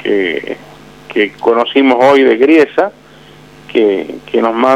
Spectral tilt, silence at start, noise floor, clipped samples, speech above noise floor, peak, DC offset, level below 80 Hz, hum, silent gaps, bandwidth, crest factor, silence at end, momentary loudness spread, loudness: -5.5 dB/octave; 0 s; -38 dBFS; under 0.1%; 28 dB; 0 dBFS; 0.3%; -54 dBFS; none; none; 10 kHz; 12 dB; 0 s; 12 LU; -11 LUFS